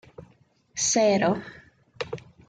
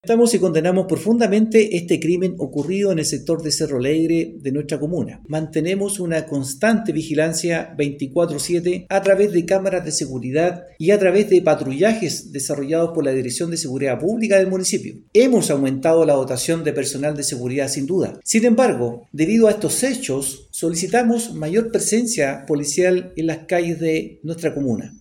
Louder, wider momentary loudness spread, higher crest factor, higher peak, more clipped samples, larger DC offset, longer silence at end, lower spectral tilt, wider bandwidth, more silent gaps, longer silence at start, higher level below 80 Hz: second, -24 LUFS vs -19 LUFS; first, 17 LU vs 8 LU; about the same, 18 dB vs 16 dB; second, -10 dBFS vs -2 dBFS; neither; neither; first, 0.3 s vs 0.05 s; about the same, -3.5 dB/octave vs -4.5 dB/octave; second, 10 kHz vs 17 kHz; neither; first, 0.2 s vs 0.05 s; second, -62 dBFS vs -54 dBFS